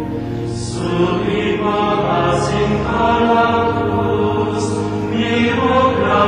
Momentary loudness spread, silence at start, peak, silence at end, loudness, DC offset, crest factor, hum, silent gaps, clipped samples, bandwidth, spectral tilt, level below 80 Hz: 7 LU; 0 s; -2 dBFS; 0 s; -16 LUFS; under 0.1%; 12 dB; none; none; under 0.1%; 10.5 kHz; -6 dB/octave; -36 dBFS